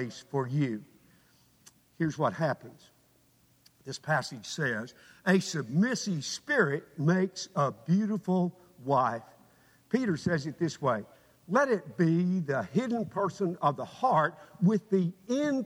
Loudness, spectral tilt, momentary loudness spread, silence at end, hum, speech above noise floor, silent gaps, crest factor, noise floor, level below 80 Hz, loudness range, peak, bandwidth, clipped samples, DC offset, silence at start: -30 LUFS; -6 dB/octave; 8 LU; 0 s; none; 36 dB; none; 18 dB; -66 dBFS; -72 dBFS; 6 LU; -12 dBFS; 13 kHz; under 0.1%; under 0.1%; 0 s